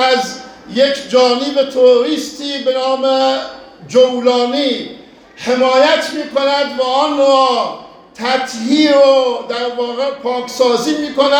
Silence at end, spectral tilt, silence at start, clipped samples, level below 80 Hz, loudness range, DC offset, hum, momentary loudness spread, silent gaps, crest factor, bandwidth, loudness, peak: 0 s; -3 dB/octave; 0 s; under 0.1%; -60 dBFS; 2 LU; under 0.1%; none; 11 LU; none; 14 dB; 13.5 kHz; -14 LUFS; 0 dBFS